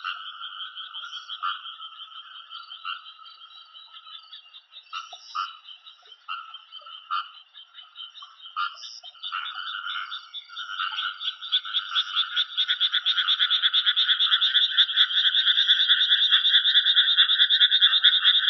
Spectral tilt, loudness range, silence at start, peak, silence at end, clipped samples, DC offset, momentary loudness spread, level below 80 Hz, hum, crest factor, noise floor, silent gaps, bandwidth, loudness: 11.5 dB/octave; 21 LU; 0 s; -4 dBFS; 0 s; under 0.1%; under 0.1%; 23 LU; under -90 dBFS; none; 22 dB; -50 dBFS; none; 6.2 kHz; -20 LUFS